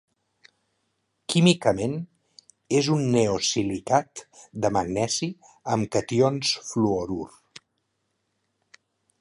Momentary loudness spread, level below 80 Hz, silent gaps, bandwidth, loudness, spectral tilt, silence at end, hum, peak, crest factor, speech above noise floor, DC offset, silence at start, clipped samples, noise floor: 17 LU; -56 dBFS; none; 11.5 kHz; -24 LUFS; -5 dB/octave; 1.95 s; none; -4 dBFS; 24 dB; 52 dB; under 0.1%; 1.3 s; under 0.1%; -76 dBFS